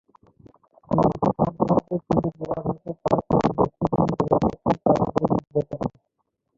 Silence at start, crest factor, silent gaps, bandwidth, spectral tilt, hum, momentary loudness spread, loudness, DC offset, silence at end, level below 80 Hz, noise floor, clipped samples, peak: 0.9 s; 20 dB; none; 7.6 kHz; -9.5 dB/octave; none; 8 LU; -23 LUFS; under 0.1%; 0.7 s; -46 dBFS; -76 dBFS; under 0.1%; -4 dBFS